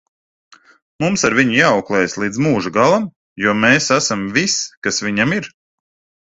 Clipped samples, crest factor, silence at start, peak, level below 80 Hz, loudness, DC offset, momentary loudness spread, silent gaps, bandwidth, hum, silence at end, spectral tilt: under 0.1%; 18 dB; 1 s; 0 dBFS; -52 dBFS; -16 LUFS; under 0.1%; 7 LU; 3.16-3.36 s, 4.77-4.82 s; 8.4 kHz; none; 0.75 s; -4 dB/octave